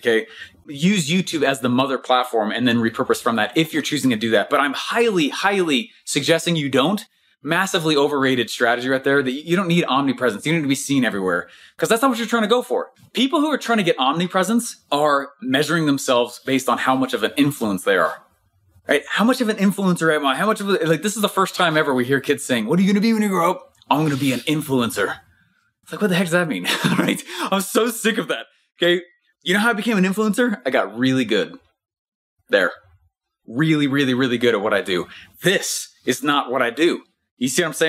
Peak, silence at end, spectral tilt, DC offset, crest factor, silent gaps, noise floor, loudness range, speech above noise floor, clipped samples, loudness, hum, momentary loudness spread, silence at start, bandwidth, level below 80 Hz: -2 dBFS; 0 s; -4.5 dB/octave; under 0.1%; 18 dB; 31.98-32.37 s, 37.31-37.37 s; -65 dBFS; 2 LU; 46 dB; under 0.1%; -19 LUFS; none; 6 LU; 0.05 s; 16 kHz; -66 dBFS